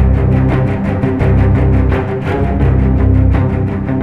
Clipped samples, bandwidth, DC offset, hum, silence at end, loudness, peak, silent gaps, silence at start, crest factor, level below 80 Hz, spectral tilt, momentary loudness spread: under 0.1%; 4.5 kHz; under 0.1%; none; 0 s; -13 LUFS; 0 dBFS; none; 0 s; 10 dB; -16 dBFS; -10 dB/octave; 5 LU